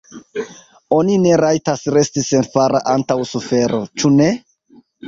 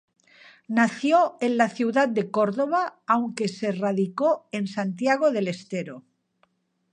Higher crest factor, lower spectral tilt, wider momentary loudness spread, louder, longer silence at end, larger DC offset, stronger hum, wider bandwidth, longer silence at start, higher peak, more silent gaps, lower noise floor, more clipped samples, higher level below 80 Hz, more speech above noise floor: second, 14 dB vs 20 dB; about the same, -5.5 dB/octave vs -6 dB/octave; first, 14 LU vs 8 LU; first, -16 LUFS vs -24 LUFS; second, 0 s vs 0.9 s; neither; neither; second, 7.8 kHz vs 10 kHz; second, 0.15 s vs 0.7 s; first, -2 dBFS vs -6 dBFS; neither; second, -50 dBFS vs -68 dBFS; neither; first, -54 dBFS vs -78 dBFS; second, 35 dB vs 45 dB